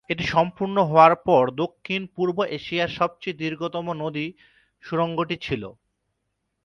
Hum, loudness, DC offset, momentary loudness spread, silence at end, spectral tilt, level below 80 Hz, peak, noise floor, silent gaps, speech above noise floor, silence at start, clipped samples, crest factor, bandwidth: none; -23 LUFS; under 0.1%; 14 LU; 0.95 s; -6.5 dB/octave; -56 dBFS; -2 dBFS; -77 dBFS; none; 54 dB; 0.1 s; under 0.1%; 22 dB; 10.5 kHz